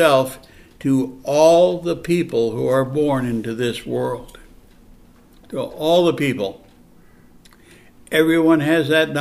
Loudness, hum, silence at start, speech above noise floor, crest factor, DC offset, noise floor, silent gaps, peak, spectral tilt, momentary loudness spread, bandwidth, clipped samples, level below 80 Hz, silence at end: -18 LUFS; none; 0 s; 30 dB; 18 dB; under 0.1%; -48 dBFS; none; -2 dBFS; -5.5 dB/octave; 12 LU; 14.5 kHz; under 0.1%; -50 dBFS; 0 s